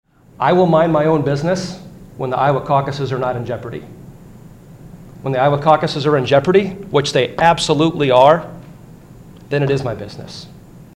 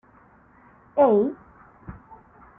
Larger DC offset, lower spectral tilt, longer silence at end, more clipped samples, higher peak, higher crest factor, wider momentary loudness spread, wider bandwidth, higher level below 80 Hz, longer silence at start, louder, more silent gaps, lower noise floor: neither; second, -6 dB/octave vs -11.5 dB/octave; second, 0.1 s vs 0.65 s; neither; first, 0 dBFS vs -8 dBFS; about the same, 16 dB vs 18 dB; second, 16 LU vs 26 LU; first, 12 kHz vs 3.7 kHz; first, -46 dBFS vs -58 dBFS; second, 0.4 s vs 0.95 s; first, -16 LUFS vs -21 LUFS; neither; second, -39 dBFS vs -55 dBFS